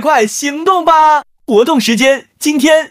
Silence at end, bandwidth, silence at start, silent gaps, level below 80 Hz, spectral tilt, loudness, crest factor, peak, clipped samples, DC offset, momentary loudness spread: 0.05 s; 16 kHz; 0 s; none; -54 dBFS; -3 dB/octave; -11 LUFS; 10 dB; 0 dBFS; under 0.1%; under 0.1%; 7 LU